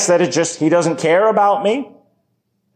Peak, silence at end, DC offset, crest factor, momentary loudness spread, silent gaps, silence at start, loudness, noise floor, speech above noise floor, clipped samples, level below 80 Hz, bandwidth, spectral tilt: -4 dBFS; 0.85 s; under 0.1%; 12 dB; 7 LU; none; 0 s; -15 LUFS; -67 dBFS; 53 dB; under 0.1%; -72 dBFS; 13.5 kHz; -4 dB/octave